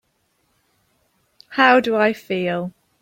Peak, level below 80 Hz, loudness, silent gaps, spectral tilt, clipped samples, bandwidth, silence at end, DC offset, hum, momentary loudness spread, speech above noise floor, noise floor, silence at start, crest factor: 0 dBFS; -66 dBFS; -18 LUFS; none; -6 dB/octave; under 0.1%; 16.5 kHz; 0.3 s; under 0.1%; none; 14 LU; 50 dB; -67 dBFS; 1.5 s; 20 dB